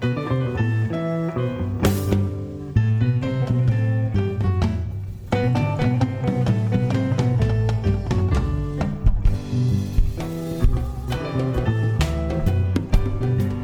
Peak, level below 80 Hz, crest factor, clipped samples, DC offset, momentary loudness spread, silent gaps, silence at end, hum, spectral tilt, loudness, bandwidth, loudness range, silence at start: -4 dBFS; -28 dBFS; 18 dB; under 0.1%; under 0.1%; 5 LU; none; 0 s; none; -8 dB/octave; -22 LUFS; 17.5 kHz; 2 LU; 0 s